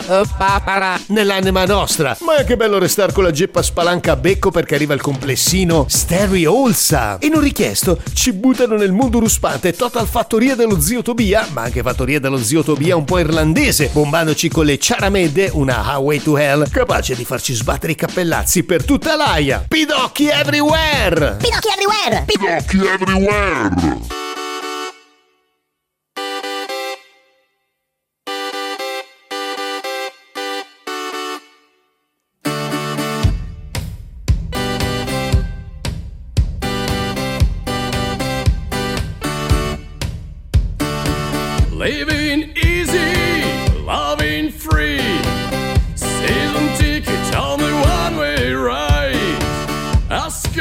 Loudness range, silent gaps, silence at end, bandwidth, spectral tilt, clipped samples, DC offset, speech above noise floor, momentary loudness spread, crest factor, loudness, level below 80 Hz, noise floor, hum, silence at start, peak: 11 LU; none; 0 s; 16.5 kHz; -4.5 dB/octave; under 0.1%; under 0.1%; 61 dB; 11 LU; 16 dB; -16 LUFS; -26 dBFS; -75 dBFS; none; 0 s; 0 dBFS